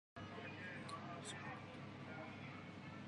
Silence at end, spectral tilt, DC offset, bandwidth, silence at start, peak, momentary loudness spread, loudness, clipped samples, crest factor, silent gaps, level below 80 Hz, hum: 0 s; -5 dB/octave; under 0.1%; 11 kHz; 0.15 s; -38 dBFS; 4 LU; -51 LUFS; under 0.1%; 14 dB; none; -74 dBFS; none